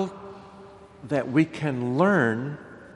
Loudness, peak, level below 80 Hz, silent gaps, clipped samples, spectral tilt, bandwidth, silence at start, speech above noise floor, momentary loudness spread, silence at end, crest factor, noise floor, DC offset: -25 LUFS; -6 dBFS; -64 dBFS; none; under 0.1%; -7.5 dB/octave; 11 kHz; 0 s; 23 dB; 22 LU; 0.05 s; 20 dB; -47 dBFS; under 0.1%